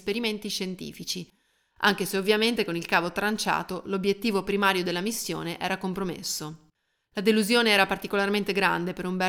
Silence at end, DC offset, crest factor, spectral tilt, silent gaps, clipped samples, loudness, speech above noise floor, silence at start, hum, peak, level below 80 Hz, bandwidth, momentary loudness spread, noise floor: 0 s; under 0.1%; 20 dB; -3.5 dB/octave; none; under 0.1%; -26 LUFS; 42 dB; 0.05 s; none; -6 dBFS; -60 dBFS; 19.5 kHz; 11 LU; -69 dBFS